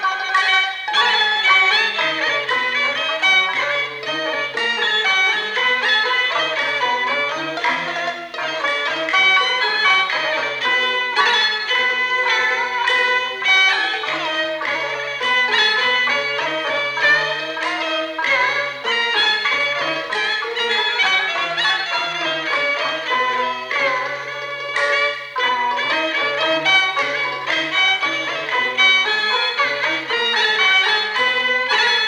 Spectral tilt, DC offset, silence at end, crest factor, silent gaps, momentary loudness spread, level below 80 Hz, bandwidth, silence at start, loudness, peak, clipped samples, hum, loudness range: -1 dB/octave; under 0.1%; 0 s; 16 dB; none; 7 LU; -68 dBFS; 17.5 kHz; 0 s; -17 LUFS; -2 dBFS; under 0.1%; none; 3 LU